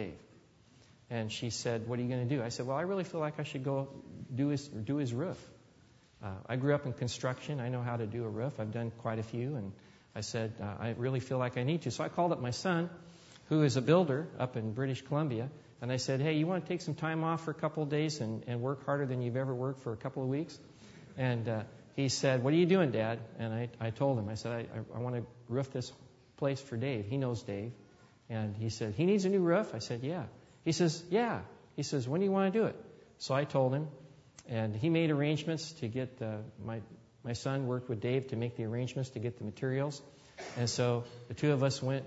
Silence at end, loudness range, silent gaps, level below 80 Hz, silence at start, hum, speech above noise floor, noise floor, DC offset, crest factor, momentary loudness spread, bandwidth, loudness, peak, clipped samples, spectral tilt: 0 s; 5 LU; none; -70 dBFS; 0 s; none; 29 dB; -63 dBFS; under 0.1%; 22 dB; 13 LU; 8 kHz; -35 LUFS; -14 dBFS; under 0.1%; -6 dB/octave